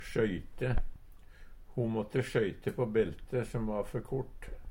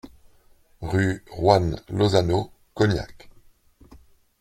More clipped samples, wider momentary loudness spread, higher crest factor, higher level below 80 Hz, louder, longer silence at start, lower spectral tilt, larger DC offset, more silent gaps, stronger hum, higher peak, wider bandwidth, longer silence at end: neither; second, 8 LU vs 14 LU; about the same, 18 dB vs 22 dB; about the same, -44 dBFS vs -46 dBFS; second, -35 LUFS vs -23 LUFS; about the same, 0 s vs 0.05 s; about the same, -7.5 dB/octave vs -6.5 dB/octave; neither; neither; neither; second, -16 dBFS vs -2 dBFS; first, 16.5 kHz vs 12.5 kHz; second, 0 s vs 1.3 s